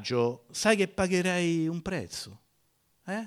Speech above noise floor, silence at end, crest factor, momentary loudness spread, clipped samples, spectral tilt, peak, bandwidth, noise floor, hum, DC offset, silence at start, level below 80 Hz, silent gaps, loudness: 42 dB; 0 s; 20 dB; 14 LU; under 0.1%; -4.5 dB/octave; -10 dBFS; 15.5 kHz; -71 dBFS; none; under 0.1%; 0 s; -58 dBFS; none; -29 LUFS